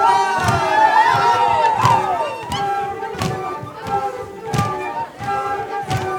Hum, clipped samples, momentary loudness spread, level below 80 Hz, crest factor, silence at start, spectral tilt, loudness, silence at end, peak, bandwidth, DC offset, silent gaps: none; under 0.1%; 12 LU; -46 dBFS; 18 dB; 0 s; -4.5 dB/octave; -18 LUFS; 0 s; 0 dBFS; 18.5 kHz; under 0.1%; none